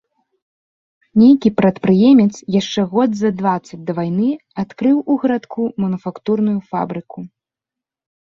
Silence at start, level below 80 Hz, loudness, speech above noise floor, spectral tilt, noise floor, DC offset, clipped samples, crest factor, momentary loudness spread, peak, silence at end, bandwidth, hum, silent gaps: 1.15 s; -56 dBFS; -16 LUFS; 71 dB; -7.5 dB/octave; -86 dBFS; under 0.1%; under 0.1%; 16 dB; 13 LU; -2 dBFS; 1 s; 7.4 kHz; none; none